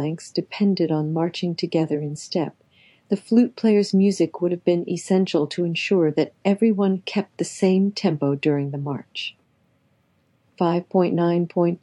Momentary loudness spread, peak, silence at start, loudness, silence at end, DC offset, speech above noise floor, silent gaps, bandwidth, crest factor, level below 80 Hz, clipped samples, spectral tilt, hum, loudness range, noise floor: 9 LU; -6 dBFS; 0 s; -22 LUFS; 0.05 s; under 0.1%; 43 dB; none; 11.5 kHz; 16 dB; -78 dBFS; under 0.1%; -6.5 dB/octave; none; 4 LU; -64 dBFS